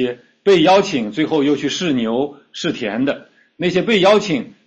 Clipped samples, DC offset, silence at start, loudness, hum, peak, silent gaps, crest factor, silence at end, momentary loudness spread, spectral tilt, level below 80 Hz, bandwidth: under 0.1%; under 0.1%; 0 s; -17 LUFS; none; -2 dBFS; none; 14 dB; 0.15 s; 11 LU; -5 dB/octave; -56 dBFS; 8.4 kHz